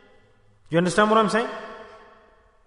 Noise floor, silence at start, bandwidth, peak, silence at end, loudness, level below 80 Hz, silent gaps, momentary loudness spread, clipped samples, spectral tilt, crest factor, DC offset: -56 dBFS; 0.7 s; 11 kHz; -6 dBFS; 0.7 s; -21 LUFS; -56 dBFS; none; 21 LU; under 0.1%; -5 dB/octave; 20 dB; under 0.1%